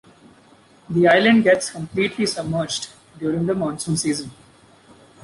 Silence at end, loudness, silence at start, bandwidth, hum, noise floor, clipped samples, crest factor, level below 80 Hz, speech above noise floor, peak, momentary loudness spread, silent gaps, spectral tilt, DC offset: 0.9 s; -20 LUFS; 0.9 s; 11.5 kHz; none; -52 dBFS; under 0.1%; 18 dB; -56 dBFS; 32 dB; -4 dBFS; 13 LU; none; -4.5 dB/octave; under 0.1%